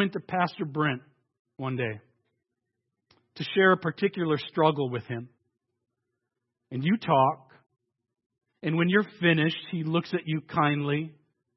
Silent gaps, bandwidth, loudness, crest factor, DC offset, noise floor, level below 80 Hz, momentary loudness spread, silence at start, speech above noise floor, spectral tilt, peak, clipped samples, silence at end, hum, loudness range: 1.39-1.45 s, 8.26-8.30 s; 6 kHz; -27 LUFS; 20 dB; under 0.1%; -84 dBFS; -74 dBFS; 14 LU; 0 s; 57 dB; -9 dB/octave; -8 dBFS; under 0.1%; 0.45 s; none; 4 LU